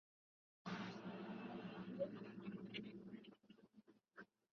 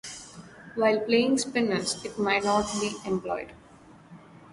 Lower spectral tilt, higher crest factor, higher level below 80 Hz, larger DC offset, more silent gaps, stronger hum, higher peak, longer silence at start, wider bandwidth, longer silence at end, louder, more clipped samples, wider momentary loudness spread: first, -5 dB/octave vs -3.5 dB/octave; about the same, 20 dB vs 18 dB; second, -86 dBFS vs -60 dBFS; neither; neither; neither; second, -34 dBFS vs -10 dBFS; first, 0.65 s vs 0.05 s; second, 7 kHz vs 11.5 kHz; first, 0.3 s vs 0.05 s; second, -52 LUFS vs -26 LUFS; neither; about the same, 17 LU vs 18 LU